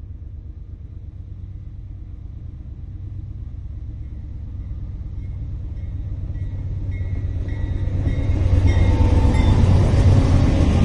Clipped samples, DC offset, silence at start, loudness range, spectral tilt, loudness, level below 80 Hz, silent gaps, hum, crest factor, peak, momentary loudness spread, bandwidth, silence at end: under 0.1%; under 0.1%; 0 s; 17 LU; -8 dB/octave; -20 LUFS; -24 dBFS; none; none; 16 dB; -4 dBFS; 20 LU; 9.6 kHz; 0 s